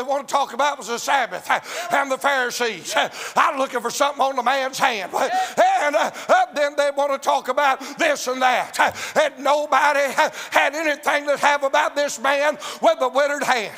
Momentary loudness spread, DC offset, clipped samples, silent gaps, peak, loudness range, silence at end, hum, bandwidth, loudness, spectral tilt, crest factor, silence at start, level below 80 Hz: 4 LU; under 0.1%; under 0.1%; none; 0 dBFS; 2 LU; 0 s; none; 16 kHz; -20 LUFS; -1.5 dB/octave; 20 dB; 0 s; -74 dBFS